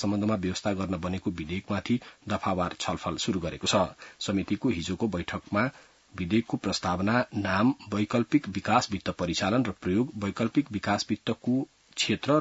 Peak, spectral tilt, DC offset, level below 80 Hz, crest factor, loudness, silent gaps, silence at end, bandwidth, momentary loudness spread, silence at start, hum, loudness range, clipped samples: -10 dBFS; -5 dB/octave; under 0.1%; -58 dBFS; 18 dB; -29 LUFS; none; 0 s; 8 kHz; 6 LU; 0 s; none; 3 LU; under 0.1%